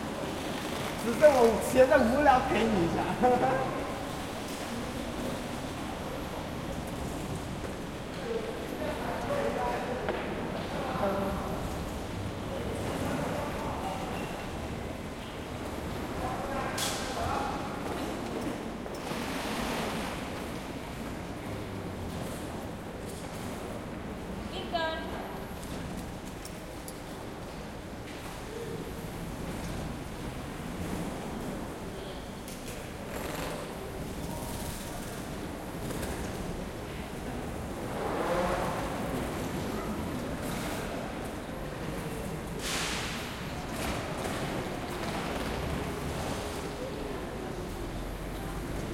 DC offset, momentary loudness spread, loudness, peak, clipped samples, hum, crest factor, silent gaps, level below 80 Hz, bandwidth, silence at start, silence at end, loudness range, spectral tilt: under 0.1%; 10 LU; -34 LUFS; -8 dBFS; under 0.1%; none; 24 dB; none; -46 dBFS; 16.5 kHz; 0 s; 0 s; 9 LU; -5 dB/octave